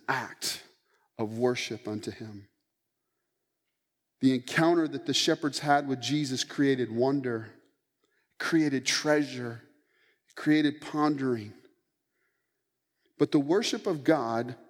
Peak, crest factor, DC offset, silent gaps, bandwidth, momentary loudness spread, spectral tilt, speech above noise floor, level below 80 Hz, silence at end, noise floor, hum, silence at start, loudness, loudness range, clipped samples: -10 dBFS; 20 dB; under 0.1%; none; 16.5 kHz; 12 LU; -4.5 dB/octave; 55 dB; -82 dBFS; 0.15 s; -83 dBFS; none; 0.1 s; -28 LUFS; 7 LU; under 0.1%